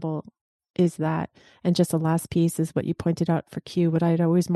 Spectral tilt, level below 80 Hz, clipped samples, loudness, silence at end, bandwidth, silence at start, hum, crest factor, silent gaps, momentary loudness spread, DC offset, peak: -7 dB/octave; -60 dBFS; under 0.1%; -25 LUFS; 0 s; 12.5 kHz; 0 s; none; 16 dB; 0.41-0.59 s, 0.70-0.74 s; 9 LU; under 0.1%; -8 dBFS